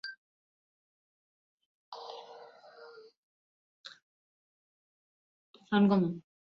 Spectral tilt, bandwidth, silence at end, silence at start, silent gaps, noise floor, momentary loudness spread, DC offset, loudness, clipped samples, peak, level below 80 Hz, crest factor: -6 dB/octave; 6.2 kHz; 0.3 s; 0.05 s; 0.18-1.58 s, 1.66-1.92 s, 3.17-3.84 s, 4.02-5.54 s; -54 dBFS; 27 LU; under 0.1%; -29 LUFS; under 0.1%; -16 dBFS; -80 dBFS; 20 dB